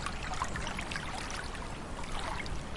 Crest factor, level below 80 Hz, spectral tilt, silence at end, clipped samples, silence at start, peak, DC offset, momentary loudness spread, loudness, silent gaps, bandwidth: 20 dB; -42 dBFS; -3.5 dB/octave; 0 s; under 0.1%; 0 s; -18 dBFS; under 0.1%; 5 LU; -38 LUFS; none; 11.5 kHz